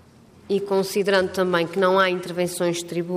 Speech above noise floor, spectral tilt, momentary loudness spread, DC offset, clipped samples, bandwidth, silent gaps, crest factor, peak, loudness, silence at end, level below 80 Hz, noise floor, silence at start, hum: 27 dB; -4.5 dB/octave; 8 LU; under 0.1%; under 0.1%; 15.5 kHz; none; 16 dB; -8 dBFS; -22 LUFS; 0 s; -64 dBFS; -49 dBFS; 0.5 s; none